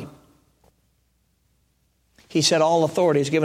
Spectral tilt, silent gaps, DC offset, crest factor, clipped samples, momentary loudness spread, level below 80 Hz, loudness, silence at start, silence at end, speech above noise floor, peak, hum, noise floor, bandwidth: -4 dB/octave; none; under 0.1%; 18 dB; under 0.1%; 9 LU; -64 dBFS; -20 LUFS; 0 s; 0 s; 48 dB; -6 dBFS; none; -67 dBFS; 15.5 kHz